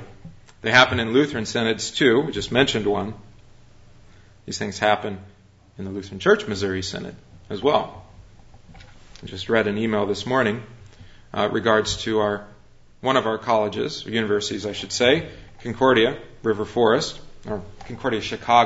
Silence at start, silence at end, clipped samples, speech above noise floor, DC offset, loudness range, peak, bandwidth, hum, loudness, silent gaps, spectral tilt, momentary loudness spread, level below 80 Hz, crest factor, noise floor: 0 s; 0 s; under 0.1%; 27 dB; under 0.1%; 5 LU; -2 dBFS; 8 kHz; none; -22 LUFS; none; -4.5 dB/octave; 15 LU; -50 dBFS; 22 dB; -49 dBFS